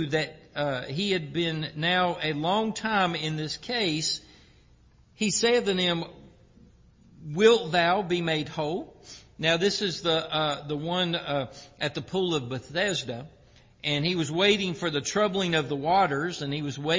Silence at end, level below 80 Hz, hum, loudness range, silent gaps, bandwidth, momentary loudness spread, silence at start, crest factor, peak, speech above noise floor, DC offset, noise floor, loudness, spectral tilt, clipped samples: 0 s; -60 dBFS; none; 4 LU; none; 7.8 kHz; 10 LU; 0 s; 20 dB; -6 dBFS; 31 dB; under 0.1%; -58 dBFS; -26 LUFS; -4 dB/octave; under 0.1%